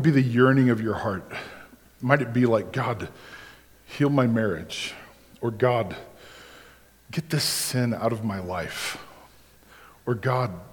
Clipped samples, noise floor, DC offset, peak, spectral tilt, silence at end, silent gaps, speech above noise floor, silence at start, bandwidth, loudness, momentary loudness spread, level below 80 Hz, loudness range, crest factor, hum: under 0.1%; -53 dBFS; under 0.1%; -2 dBFS; -5.5 dB/octave; 0.05 s; none; 29 dB; 0 s; 19 kHz; -25 LUFS; 21 LU; -58 dBFS; 4 LU; 24 dB; none